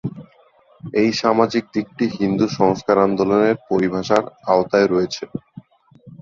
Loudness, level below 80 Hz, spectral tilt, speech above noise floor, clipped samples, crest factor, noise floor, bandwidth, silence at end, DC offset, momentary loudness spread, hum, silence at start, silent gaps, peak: -18 LUFS; -54 dBFS; -6 dB/octave; 36 dB; under 0.1%; 18 dB; -53 dBFS; 7.6 kHz; 0.05 s; under 0.1%; 10 LU; none; 0.05 s; none; 0 dBFS